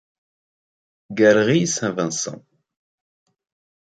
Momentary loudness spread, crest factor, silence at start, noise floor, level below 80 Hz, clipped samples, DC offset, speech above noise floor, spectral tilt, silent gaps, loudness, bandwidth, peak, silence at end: 13 LU; 20 dB; 1.1 s; under -90 dBFS; -64 dBFS; under 0.1%; under 0.1%; over 72 dB; -4.5 dB/octave; none; -19 LUFS; 9.4 kHz; -4 dBFS; 1.55 s